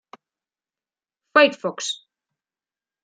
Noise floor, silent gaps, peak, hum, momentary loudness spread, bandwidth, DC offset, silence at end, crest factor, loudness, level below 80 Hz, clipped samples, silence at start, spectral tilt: under -90 dBFS; none; -2 dBFS; none; 13 LU; 9.4 kHz; under 0.1%; 1.1 s; 24 dB; -20 LUFS; -82 dBFS; under 0.1%; 1.35 s; -2 dB/octave